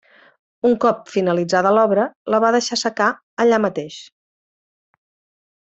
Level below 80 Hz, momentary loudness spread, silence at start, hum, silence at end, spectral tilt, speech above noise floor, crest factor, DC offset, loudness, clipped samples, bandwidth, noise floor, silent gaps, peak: -64 dBFS; 7 LU; 0.65 s; none; 1.55 s; -4.5 dB/octave; over 73 dB; 16 dB; under 0.1%; -18 LUFS; under 0.1%; 8.2 kHz; under -90 dBFS; 2.16-2.25 s, 3.23-3.37 s; -4 dBFS